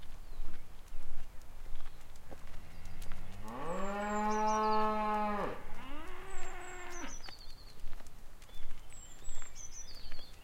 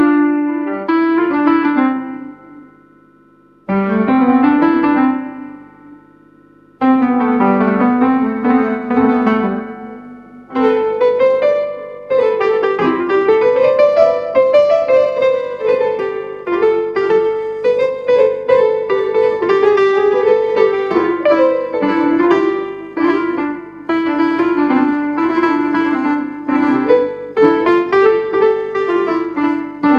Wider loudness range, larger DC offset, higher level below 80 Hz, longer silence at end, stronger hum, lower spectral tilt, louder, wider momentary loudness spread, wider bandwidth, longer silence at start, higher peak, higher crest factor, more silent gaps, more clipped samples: first, 15 LU vs 3 LU; neither; first, -42 dBFS vs -54 dBFS; about the same, 0 s vs 0 s; second, none vs 50 Hz at -50 dBFS; second, -4.5 dB/octave vs -7.5 dB/octave; second, -39 LUFS vs -14 LUFS; first, 22 LU vs 8 LU; first, 8.4 kHz vs 7 kHz; about the same, 0 s vs 0 s; second, -20 dBFS vs 0 dBFS; about the same, 12 dB vs 14 dB; neither; neither